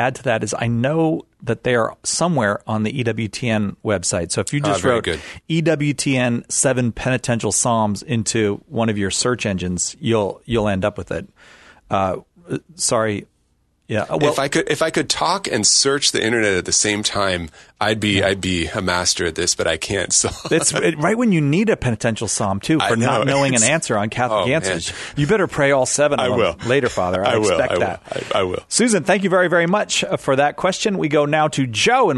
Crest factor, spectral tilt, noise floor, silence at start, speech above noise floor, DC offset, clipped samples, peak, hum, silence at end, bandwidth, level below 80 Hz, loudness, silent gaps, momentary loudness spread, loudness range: 16 dB; -3.5 dB/octave; -63 dBFS; 0 s; 44 dB; under 0.1%; under 0.1%; -2 dBFS; none; 0 s; 12.5 kHz; -46 dBFS; -18 LUFS; none; 7 LU; 4 LU